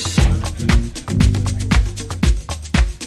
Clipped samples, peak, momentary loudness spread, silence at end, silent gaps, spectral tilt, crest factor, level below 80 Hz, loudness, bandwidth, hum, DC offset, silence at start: under 0.1%; -2 dBFS; 5 LU; 0 s; none; -5 dB/octave; 14 dB; -20 dBFS; -19 LUFS; 13 kHz; none; under 0.1%; 0 s